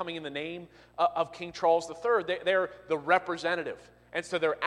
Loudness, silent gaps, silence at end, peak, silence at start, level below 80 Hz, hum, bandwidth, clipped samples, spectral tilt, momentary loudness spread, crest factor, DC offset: -30 LUFS; none; 0 s; -10 dBFS; 0 s; -68 dBFS; 60 Hz at -65 dBFS; 11 kHz; under 0.1%; -4 dB/octave; 12 LU; 20 dB; under 0.1%